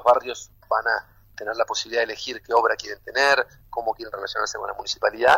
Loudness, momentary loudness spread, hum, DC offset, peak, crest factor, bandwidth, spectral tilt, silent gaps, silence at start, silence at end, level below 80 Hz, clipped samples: -24 LUFS; 11 LU; none; under 0.1%; -6 dBFS; 18 dB; 16 kHz; -1.5 dB/octave; none; 0 s; 0 s; -56 dBFS; under 0.1%